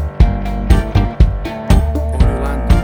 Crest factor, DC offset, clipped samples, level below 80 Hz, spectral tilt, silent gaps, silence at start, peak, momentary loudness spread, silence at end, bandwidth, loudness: 12 dB; under 0.1%; under 0.1%; -14 dBFS; -7.5 dB/octave; none; 0 s; 0 dBFS; 5 LU; 0 s; 16 kHz; -16 LUFS